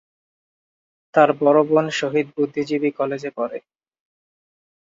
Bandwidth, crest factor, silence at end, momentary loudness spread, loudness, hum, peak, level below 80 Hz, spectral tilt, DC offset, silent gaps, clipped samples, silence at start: 7.6 kHz; 20 dB; 1.3 s; 12 LU; -20 LUFS; none; -2 dBFS; -70 dBFS; -6 dB/octave; under 0.1%; none; under 0.1%; 1.15 s